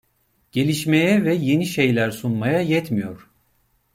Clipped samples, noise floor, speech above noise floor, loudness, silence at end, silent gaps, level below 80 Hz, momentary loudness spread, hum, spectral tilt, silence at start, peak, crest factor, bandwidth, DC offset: under 0.1%; -65 dBFS; 46 dB; -20 LUFS; 0.8 s; none; -58 dBFS; 9 LU; none; -6 dB/octave; 0.55 s; -4 dBFS; 16 dB; 16.5 kHz; under 0.1%